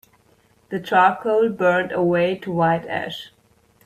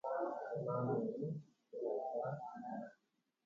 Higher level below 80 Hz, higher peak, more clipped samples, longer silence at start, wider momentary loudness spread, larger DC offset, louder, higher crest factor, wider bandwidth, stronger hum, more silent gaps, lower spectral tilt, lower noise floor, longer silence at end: first, -60 dBFS vs -84 dBFS; first, -4 dBFS vs -26 dBFS; neither; first, 0.7 s vs 0.05 s; first, 14 LU vs 11 LU; neither; first, -20 LUFS vs -43 LUFS; about the same, 16 dB vs 16 dB; first, 15 kHz vs 7.4 kHz; neither; neither; second, -7 dB/octave vs -9.5 dB/octave; second, -58 dBFS vs -84 dBFS; about the same, 0.6 s vs 0.55 s